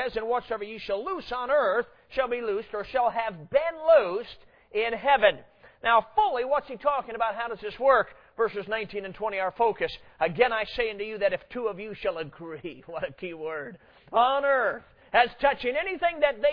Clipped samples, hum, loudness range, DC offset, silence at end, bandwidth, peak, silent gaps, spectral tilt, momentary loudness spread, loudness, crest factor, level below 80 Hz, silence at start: under 0.1%; none; 5 LU; under 0.1%; 0 s; 5.4 kHz; -6 dBFS; none; -6.5 dB/octave; 13 LU; -27 LUFS; 20 dB; -56 dBFS; 0 s